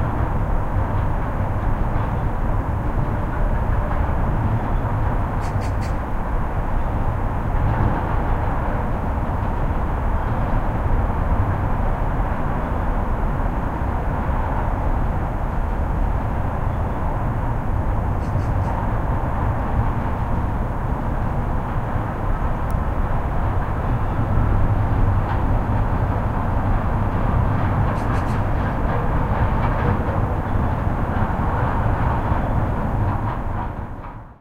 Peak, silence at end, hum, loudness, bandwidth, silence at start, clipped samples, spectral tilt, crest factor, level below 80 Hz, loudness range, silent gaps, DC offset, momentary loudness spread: -6 dBFS; 0.05 s; none; -23 LUFS; 6.8 kHz; 0 s; under 0.1%; -9 dB/octave; 14 dB; -24 dBFS; 2 LU; none; under 0.1%; 4 LU